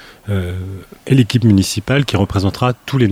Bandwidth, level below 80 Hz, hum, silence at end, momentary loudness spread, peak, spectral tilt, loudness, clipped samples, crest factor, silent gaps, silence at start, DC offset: 15.5 kHz; -40 dBFS; none; 0 s; 13 LU; 0 dBFS; -6 dB/octave; -16 LUFS; under 0.1%; 16 dB; none; 0 s; under 0.1%